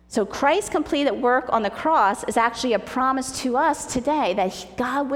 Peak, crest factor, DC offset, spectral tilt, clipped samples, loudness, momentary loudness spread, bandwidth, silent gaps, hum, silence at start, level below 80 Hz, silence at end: -6 dBFS; 16 dB; under 0.1%; -3.5 dB/octave; under 0.1%; -22 LUFS; 5 LU; 17 kHz; none; none; 0.1 s; -50 dBFS; 0 s